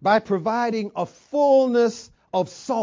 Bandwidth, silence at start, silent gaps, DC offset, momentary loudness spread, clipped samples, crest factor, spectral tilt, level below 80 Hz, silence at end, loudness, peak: 7.6 kHz; 0 s; none; under 0.1%; 11 LU; under 0.1%; 16 dB; -5.5 dB/octave; -66 dBFS; 0 s; -22 LUFS; -6 dBFS